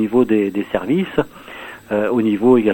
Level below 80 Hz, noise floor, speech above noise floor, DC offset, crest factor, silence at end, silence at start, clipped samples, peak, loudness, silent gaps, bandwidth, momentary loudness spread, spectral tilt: -48 dBFS; -35 dBFS; 19 dB; under 0.1%; 16 dB; 0 s; 0 s; under 0.1%; 0 dBFS; -18 LUFS; none; 17 kHz; 18 LU; -8 dB/octave